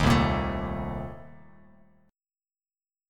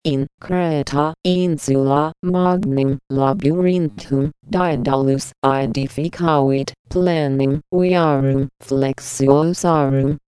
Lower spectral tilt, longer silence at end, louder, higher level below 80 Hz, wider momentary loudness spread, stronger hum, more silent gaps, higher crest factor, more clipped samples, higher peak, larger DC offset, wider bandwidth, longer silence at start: about the same, -6.5 dB/octave vs -7 dB/octave; first, 1.75 s vs 0.15 s; second, -28 LUFS vs -18 LUFS; about the same, -40 dBFS vs -44 dBFS; first, 18 LU vs 6 LU; neither; second, none vs 0.34-0.38 s, 2.19-2.23 s, 5.38-5.42 s, 6.79-6.85 s; about the same, 20 dB vs 18 dB; neither; second, -10 dBFS vs 0 dBFS; neither; first, 17 kHz vs 11 kHz; about the same, 0 s vs 0.05 s